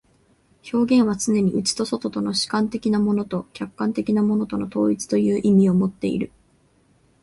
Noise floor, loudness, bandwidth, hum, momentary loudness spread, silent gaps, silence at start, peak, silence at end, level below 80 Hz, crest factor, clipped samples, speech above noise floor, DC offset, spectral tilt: -60 dBFS; -21 LUFS; 11.5 kHz; none; 9 LU; none; 0.65 s; -8 dBFS; 0.95 s; -56 dBFS; 14 dB; under 0.1%; 39 dB; under 0.1%; -5.5 dB/octave